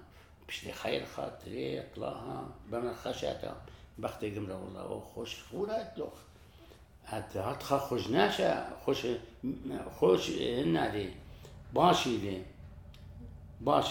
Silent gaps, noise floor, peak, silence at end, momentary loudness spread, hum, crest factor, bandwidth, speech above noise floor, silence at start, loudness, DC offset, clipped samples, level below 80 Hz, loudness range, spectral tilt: none; -56 dBFS; -10 dBFS; 0 s; 22 LU; none; 24 dB; 19 kHz; 23 dB; 0 s; -34 LUFS; under 0.1%; under 0.1%; -56 dBFS; 9 LU; -5 dB/octave